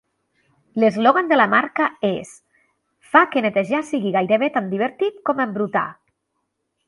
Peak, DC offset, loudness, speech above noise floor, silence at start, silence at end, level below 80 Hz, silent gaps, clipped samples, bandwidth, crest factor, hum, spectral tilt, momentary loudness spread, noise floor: 0 dBFS; under 0.1%; -19 LUFS; 56 dB; 0.75 s; 0.95 s; -68 dBFS; none; under 0.1%; 11.5 kHz; 20 dB; none; -6 dB/octave; 9 LU; -75 dBFS